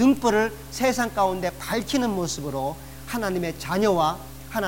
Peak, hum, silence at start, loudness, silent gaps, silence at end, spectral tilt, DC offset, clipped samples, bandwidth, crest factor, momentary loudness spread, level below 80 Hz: -10 dBFS; none; 0 s; -25 LUFS; none; 0 s; -4.5 dB/octave; 0.4%; under 0.1%; 19 kHz; 14 dB; 10 LU; -46 dBFS